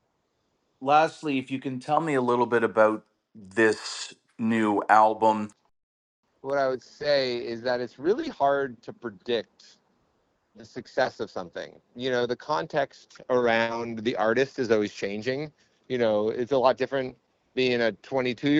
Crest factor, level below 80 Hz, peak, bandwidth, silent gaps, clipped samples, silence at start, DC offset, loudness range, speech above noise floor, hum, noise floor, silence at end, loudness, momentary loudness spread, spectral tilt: 22 dB; -68 dBFS; -4 dBFS; 10.5 kHz; 5.83-6.23 s; under 0.1%; 0.8 s; under 0.1%; 6 LU; 48 dB; none; -74 dBFS; 0 s; -26 LUFS; 14 LU; -5 dB/octave